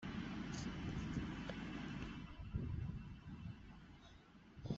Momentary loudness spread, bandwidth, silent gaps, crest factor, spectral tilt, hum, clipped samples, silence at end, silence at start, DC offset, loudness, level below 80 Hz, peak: 16 LU; 8 kHz; none; 18 dB; -6 dB/octave; none; under 0.1%; 0 s; 0 s; under 0.1%; -48 LUFS; -56 dBFS; -30 dBFS